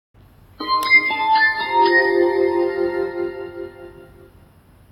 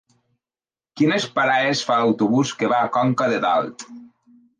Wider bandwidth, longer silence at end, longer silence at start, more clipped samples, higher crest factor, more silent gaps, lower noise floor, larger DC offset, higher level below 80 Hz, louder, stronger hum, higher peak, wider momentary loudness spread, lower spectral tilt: first, 16.5 kHz vs 10 kHz; first, 0.9 s vs 0.55 s; second, 0.6 s vs 0.95 s; neither; about the same, 16 dB vs 14 dB; neither; second, -50 dBFS vs under -90 dBFS; neither; first, -54 dBFS vs -68 dBFS; first, -17 LUFS vs -20 LUFS; neither; about the same, -4 dBFS vs -6 dBFS; first, 18 LU vs 4 LU; about the same, -4 dB/octave vs -5 dB/octave